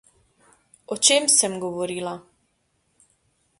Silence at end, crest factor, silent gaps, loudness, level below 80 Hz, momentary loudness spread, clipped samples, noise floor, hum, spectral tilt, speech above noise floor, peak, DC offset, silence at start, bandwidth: 1.4 s; 24 dB; none; -20 LUFS; -70 dBFS; 18 LU; under 0.1%; -70 dBFS; none; -1 dB/octave; 48 dB; -2 dBFS; under 0.1%; 0.9 s; 11.5 kHz